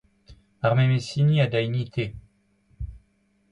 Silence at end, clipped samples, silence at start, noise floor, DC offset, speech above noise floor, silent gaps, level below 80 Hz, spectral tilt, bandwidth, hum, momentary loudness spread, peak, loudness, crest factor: 0.55 s; under 0.1%; 0.3 s; -66 dBFS; under 0.1%; 44 dB; none; -46 dBFS; -7.5 dB/octave; 10.5 kHz; none; 19 LU; -10 dBFS; -24 LUFS; 16 dB